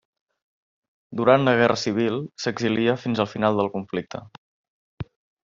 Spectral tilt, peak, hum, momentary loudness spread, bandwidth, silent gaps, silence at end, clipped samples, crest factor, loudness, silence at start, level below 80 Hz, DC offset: -4.5 dB/octave; -2 dBFS; none; 20 LU; 7.6 kHz; 4.38-4.98 s; 0.45 s; under 0.1%; 22 dB; -22 LUFS; 1.1 s; -60 dBFS; under 0.1%